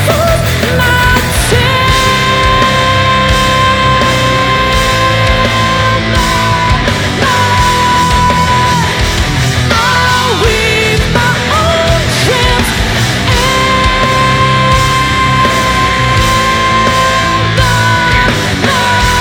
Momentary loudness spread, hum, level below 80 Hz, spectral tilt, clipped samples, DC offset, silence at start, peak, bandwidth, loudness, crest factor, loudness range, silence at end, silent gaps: 2 LU; none; -20 dBFS; -4 dB/octave; under 0.1%; under 0.1%; 0 s; 0 dBFS; over 20 kHz; -9 LUFS; 10 dB; 1 LU; 0 s; none